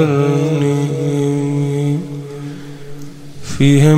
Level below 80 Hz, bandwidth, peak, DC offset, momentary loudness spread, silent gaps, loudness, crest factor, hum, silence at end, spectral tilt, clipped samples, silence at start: -46 dBFS; 12.5 kHz; 0 dBFS; under 0.1%; 19 LU; none; -16 LUFS; 14 dB; none; 0 s; -7 dB/octave; under 0.1%; 0 s